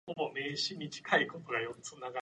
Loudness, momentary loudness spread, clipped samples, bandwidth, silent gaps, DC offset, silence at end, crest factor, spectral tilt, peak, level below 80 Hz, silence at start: -35 LUFS; 11 LU; under 0.1%; 11 kHz; none; under 0.1%; 0 s; 22 dB; -3 dB/octave; -14 dBFS; -78 dBFS; 0.05 s